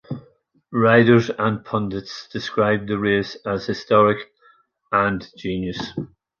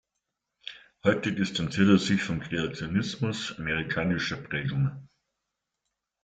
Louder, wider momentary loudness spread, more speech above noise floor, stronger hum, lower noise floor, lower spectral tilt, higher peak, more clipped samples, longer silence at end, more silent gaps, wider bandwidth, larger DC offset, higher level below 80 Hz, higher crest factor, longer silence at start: first, -20 LUFS vs -28 LUFS; about the same, 15 LU vs 14 LU; second, 37 dB vs 57 dB; neither; second, -57 dBFS vs -84 dBFS; first, -7 dB/octave vs -5.5 dB/octave; first, -2 dBFS vs -8 dBFS; neither; second, 0.35 s vs 1.2 s; neither; second, 7 kHz vs 9 kHz; neither; first, -52 dBFS vs -58 dBFS; about the same, 18 dB vs 20 dB; second, 0.1 s vs 0.65 s